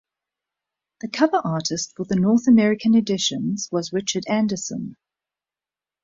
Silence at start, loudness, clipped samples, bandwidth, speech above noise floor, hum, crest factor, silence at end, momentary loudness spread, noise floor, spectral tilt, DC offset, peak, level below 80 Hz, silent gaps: 1.05 s; -21 LUFS; under 0.1%; 7.8 kHz; over 70 dB; none; 18 dB; 1.1 s; 13 LU; under -90 dBFS; -4.5 dB/octave; under 0.1%; -4 dBFS; -60 dBFS; none